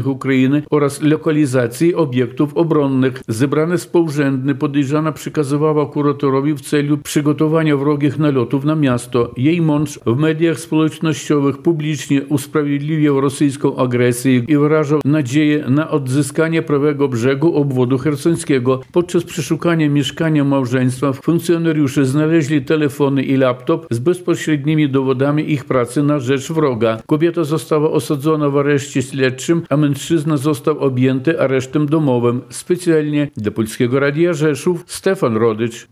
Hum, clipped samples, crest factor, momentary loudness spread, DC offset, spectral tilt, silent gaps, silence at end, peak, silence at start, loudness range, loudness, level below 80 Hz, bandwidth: none; under 0.1%; 14 dB; 4 LU; under 0.1%; -6.5 dB/octave; none; 0.1 s; -2 dBFS; 0 s; 1 LU; -16 LUFS; -58 dBFS; 15 kHz